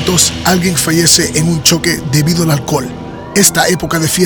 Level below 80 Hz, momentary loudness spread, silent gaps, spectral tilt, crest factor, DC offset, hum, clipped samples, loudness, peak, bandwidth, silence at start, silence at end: -34 dBFS; 9 LU; none; -3.5 dB/octave; 12 dB; under 0.1%; none; 0.2%; -10 LUFS; 0 dBFS; over 20 kHz; 0 s; 0 s